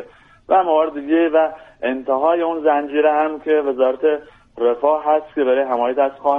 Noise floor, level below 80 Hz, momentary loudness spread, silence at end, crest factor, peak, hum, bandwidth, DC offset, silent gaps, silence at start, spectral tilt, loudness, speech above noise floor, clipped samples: -40 dBFS; -58 dBFS; 5 LU; 0 s; 14 dB; -4 dBFS; none; 3.9 kHz; under 0.1%; none; 0 s; -6.5 dB/octave; -18 LUFS; 23 dB; under 0.1%